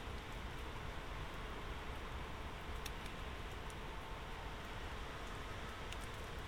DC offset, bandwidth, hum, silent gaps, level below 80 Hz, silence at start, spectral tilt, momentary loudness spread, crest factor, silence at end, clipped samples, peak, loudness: 0.1%; 18.5 kHz; none; none; -50 dBFS; 0 s; -4.5 dB/octave; 1 LU; 20 dB; 0 s; under 0.1%; -26 dBFS; -48 LUFS